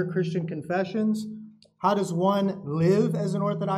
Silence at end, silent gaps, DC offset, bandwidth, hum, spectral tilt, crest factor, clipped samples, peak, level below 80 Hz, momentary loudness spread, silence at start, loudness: 0 s; none; under 0.1%; 13.5 kHz; none; -7.5 dB/octave; 16 dB; under 0.1%; -8 dBFS; -70 dBFS; 8 LU; 0 s; -26 LUFS